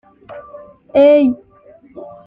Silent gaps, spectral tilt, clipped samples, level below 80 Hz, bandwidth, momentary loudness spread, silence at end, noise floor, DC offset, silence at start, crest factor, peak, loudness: none; -8 dB/octave; under 0.1%; -56 dBFS; 5 kHz; 26 LU; 0.2 s; -45 dBFS; under 0.1%; 0.3 s; 14 dB; -2 dBFS; -12 LUFS